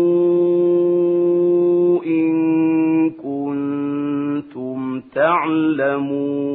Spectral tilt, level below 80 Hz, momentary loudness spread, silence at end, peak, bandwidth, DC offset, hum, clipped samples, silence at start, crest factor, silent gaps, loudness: -12 dB/octave; -66 dBFS; 9 LU; 0 s; -4 dBFS; 3.9 kHz; under 0.1%; none; under 0.1%; 0 s; 14 dB; none; -18 LUFS